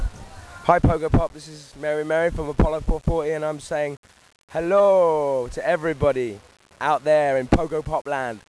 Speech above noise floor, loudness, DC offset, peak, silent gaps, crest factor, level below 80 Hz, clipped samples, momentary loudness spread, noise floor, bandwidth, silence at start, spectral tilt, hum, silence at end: 19 dB; -22 LUFS; under 0.1%; -2 dBFS; 3.97-4.03 s, 4.43-4.48 s, 8.01-8.05 s; 20 dB; -32 dBFS; under 0.1%; 13 LU; -40 dBFS; 11 kHz; 0 s; -7 dB/octave; none; 0.1 s